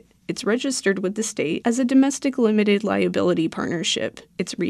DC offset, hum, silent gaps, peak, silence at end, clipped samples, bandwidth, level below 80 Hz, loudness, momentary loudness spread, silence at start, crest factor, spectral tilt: under 0.1%; none; none; -8 dBFS; 0 s; under 0.1%; 13 kHz; -62 dBFS; -22 LUFS; 9 LU; 0.3 s; 14 dB; -4.5 dB/octave